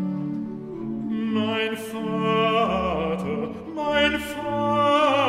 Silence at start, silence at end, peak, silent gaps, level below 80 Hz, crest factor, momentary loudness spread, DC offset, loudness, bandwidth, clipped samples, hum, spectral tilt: 0 s; 0 s; -6 dBFS; none; -48 dBFS; 18 dB; 11 LU; under 0.1%; -24 LUFS; 15.5 kHz; under 0.1%; none; -5.5 dB/octave